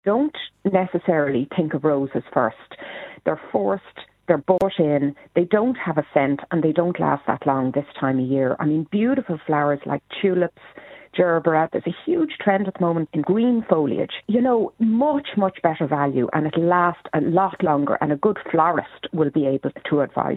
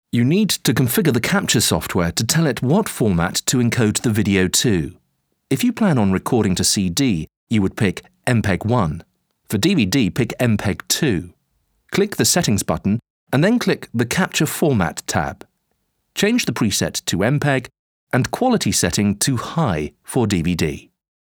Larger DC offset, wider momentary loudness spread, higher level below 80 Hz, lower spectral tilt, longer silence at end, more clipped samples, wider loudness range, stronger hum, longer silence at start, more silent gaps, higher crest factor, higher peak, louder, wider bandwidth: neither; about the same, 6 LU vs 6 LU; second, -62 dBFS vs -44 dBFS; first, -9.5 dB/octave vs -4.5 dB/octave; second, 0 s vs 0.5 s; neither; about the same, 3 LU vs 3 LU; neither; about the same, 0.05 s vs 0.15 s; second, none vs 7.37-7.47 s, 13.10-13.27 s, 17.79-18.07 s; about the same, 18 dB vs 18 dB; about the same, -2 dBFS vs 0 dBFS; about the same, -21 LUFS vs -19 LUFS; second, 4.1 kHz vs over 20 kHz